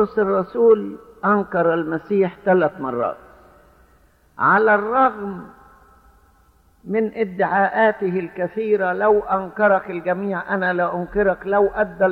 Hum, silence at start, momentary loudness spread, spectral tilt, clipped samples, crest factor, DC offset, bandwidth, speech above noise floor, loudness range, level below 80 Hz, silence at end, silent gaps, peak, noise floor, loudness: none; 0 s; 9 LU; -9 dB/octave; under 0.1%; 16 dB; under 0.1%; 4.8 kHz; 36 dB; 3 LU; -52 dBFS; 0 s; none; -4 dBFS; -55 dBFS; -19 LUFS